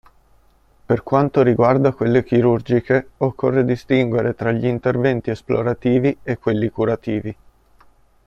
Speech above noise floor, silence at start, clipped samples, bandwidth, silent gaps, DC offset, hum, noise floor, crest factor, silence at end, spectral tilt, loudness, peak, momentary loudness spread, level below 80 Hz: 37 dB; 0.9 s; under 0.1%; 7.2 kHz; none; under 0.1%; none; -54 dBFS; 16 dB; 0.95 s; -9 dB/octave; -19 LUFS; -2 dBFS; 7 LU; -50 dBFS